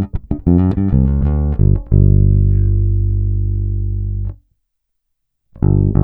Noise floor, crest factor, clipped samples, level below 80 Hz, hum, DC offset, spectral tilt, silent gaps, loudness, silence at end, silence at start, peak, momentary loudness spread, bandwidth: -71 dBFS; 12 dB; under 0.1%; -18 dBFS; none; under 0.1%; -14 dB/octave; none; -15 LUFS; 0 s; 0 s; -2 dBFS; 9 LU; 2 kHz